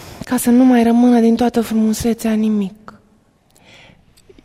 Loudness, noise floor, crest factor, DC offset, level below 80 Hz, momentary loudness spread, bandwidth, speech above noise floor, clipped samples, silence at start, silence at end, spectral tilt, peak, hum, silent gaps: -14 LUFS; -54 dBFS; 14 dB; under 0.1%; -46 dBFS; 8 LU; 15.5 kHz; 41 dB; under 0.1%; 0 s; 1.7 s; -5.5 dB/octave; -2 dBFS; none; none